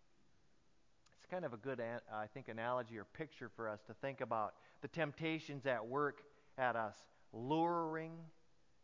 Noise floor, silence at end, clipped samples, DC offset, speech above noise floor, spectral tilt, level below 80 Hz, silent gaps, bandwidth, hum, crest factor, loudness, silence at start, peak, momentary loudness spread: -77 dBFS; 0.55 s; under 0.1%; under 0.1%; 34 dB; -7 dB/octave; -82 dBFS; none; 7.6 kHz; none; 22 dB; -43 LUFS; 1.2 s; -22 dBFS; 13 LU